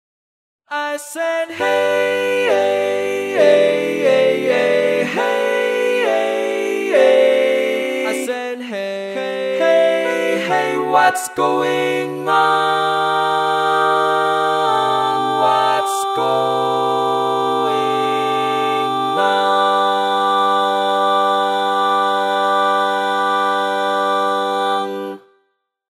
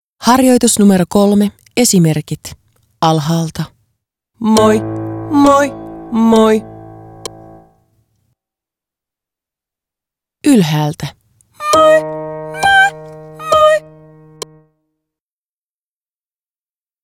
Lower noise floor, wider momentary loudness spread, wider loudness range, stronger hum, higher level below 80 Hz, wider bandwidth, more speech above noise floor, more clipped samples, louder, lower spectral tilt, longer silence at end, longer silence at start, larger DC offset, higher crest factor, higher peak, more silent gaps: second, -67 dBFS vs under -90 dBFS; second, 7 LU vs 21 LU; second, 2 LU vs 6 LU; neither; second, -72 dBFS vs -46 dBFS; about the same, 15.5 kHz vs 17 kHz; second, 51 dB vs over 79 dB; neither; second, -16 LUFS vs -12 LUFS; second, -3.5 dB/octave vs -5 dB/octave; second, 0.75 s vs 3.25 s; first, 0.7 s vs 0.2 s; neither; about the same, 16 dB vs 14 dB; about the same, -2 dBFS vs 0 dBFS; neither